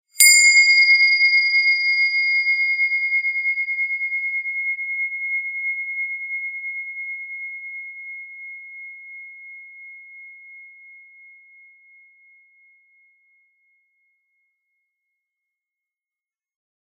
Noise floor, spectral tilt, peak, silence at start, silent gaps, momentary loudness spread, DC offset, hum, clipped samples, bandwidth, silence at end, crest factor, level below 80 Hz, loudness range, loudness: under -90 dBFS; 15 dB/octave; 0 dBFS; 0.15 s; none; 25 LU; under 0.1%; none; under 0.1%; 7.4 kHz; 6.05 s; 22 dB; under -90 dBFS; 24 LU; -16 LUFS